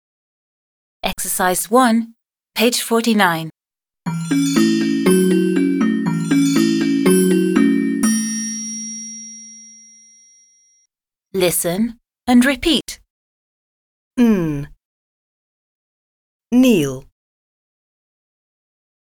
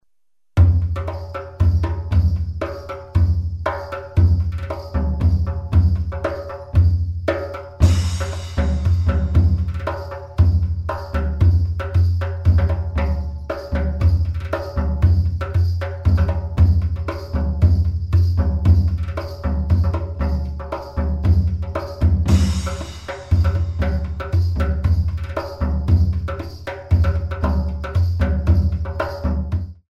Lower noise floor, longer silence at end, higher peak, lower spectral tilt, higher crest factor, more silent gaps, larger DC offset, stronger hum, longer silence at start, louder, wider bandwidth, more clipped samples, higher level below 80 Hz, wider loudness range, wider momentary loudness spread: about the same, -86 dBFS vs -83 dBFS; first, 2.2 s vs 0.2 s; about the same, 0 dBFS vs -2 dBFS; second, -4.5 dB/octave vs -8 dB/octave; about the same, 18 dB vs 16 dB; first, 13.10-14.11 s, 14.85-16.40 s vs none; second, under 0.1% vs 0.2%; neither; first, 1.05 s vs 0.55 s; first, -17 LUFS vs -20 LUFS; first, over 20 kHz vs 8.2 kHz; neither; second, -48 dBFS vs -24 dBFS; first, 8 LU vs 2 LU; first, 14 LU vs 10 LU